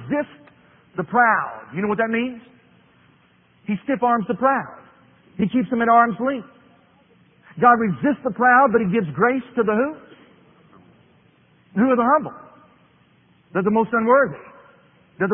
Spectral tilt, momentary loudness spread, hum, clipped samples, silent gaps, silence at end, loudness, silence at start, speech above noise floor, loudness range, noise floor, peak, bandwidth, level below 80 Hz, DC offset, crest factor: -11.5 dB/octave; 15 LU; none; under 0.1%; none; 0 s; -20 LUFS; 0 s; 38 dB; 6 LU; -57 dBFS; -2 dBFS; 3.6 kHz; -60 dBFS; under 0.1%; 20 dB